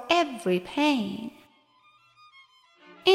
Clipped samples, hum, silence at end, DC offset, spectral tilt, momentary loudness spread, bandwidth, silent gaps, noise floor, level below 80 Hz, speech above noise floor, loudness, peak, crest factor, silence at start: under 0.1%; none; 0 s; under 0.1%; -4.5 dB/octave; 13 LU; 13.5 kHz; none; -61 dBFS; -68 dBFS; 34 dB; -27 LUFS; -6 dBFS; 22 dB; 0 s